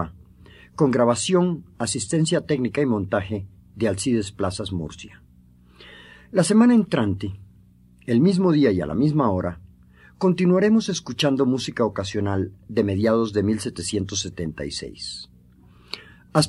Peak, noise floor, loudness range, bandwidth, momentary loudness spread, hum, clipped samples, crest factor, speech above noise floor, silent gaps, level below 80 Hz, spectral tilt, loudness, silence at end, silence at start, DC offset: -2 dBFS; -52 dBFS; 5 LU; 12 kHz; 15 LU; none; under 0.1%; 20 dB; 31 dB; none; -52 dBFS; -5.5 dB/octave; -22 LUFS; 0 s; 0 s; under 0.1%